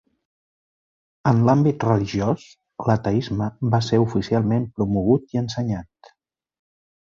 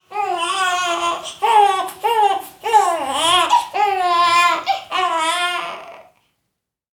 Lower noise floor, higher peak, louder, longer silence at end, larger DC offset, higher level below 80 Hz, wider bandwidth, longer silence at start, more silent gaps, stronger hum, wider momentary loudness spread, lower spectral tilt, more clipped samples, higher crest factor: second, -66 dBFS vs -76 dBFS; about the same, -4 dBFS vs -2 dBFS; second, -21 LUFS vs -17 LUFS; first, 1.35 s vs 0.95 s; neither; first, -48 dBFS vs -66 dBFS; second, 7.4 kHz vs 19 kHz; first, 1.25 s vs 0.1 s; neither; neither; about the same, 9 LU vs 8 LU; first, -8 dB/octave vs -0.5 dB/octave; neither; about the same, 18 dB vs 16 dB